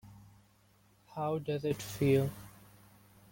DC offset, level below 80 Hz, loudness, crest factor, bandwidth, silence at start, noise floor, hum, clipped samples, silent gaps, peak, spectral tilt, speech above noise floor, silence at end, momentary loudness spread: under 0.1%; -64 dBFS; -33 LUFS; 20 dB; 17 kHz; 0.05 s; -67 dBFS; 50 Hz at -55 dBFS; under 0.1%; none; -16 dBFS; -6.5 dB/octave; 34 dB; 0.8 s; 20 LU